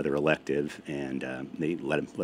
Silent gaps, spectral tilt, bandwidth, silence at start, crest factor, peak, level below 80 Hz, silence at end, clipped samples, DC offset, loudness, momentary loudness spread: none; -6.5 dB/octave; 15.5 kHz; 0 s; 22 dB; -8 dBFS; -60 dBFS; 0 s; under 0.1%; under 0.1%; -31 LUFS; 8 LU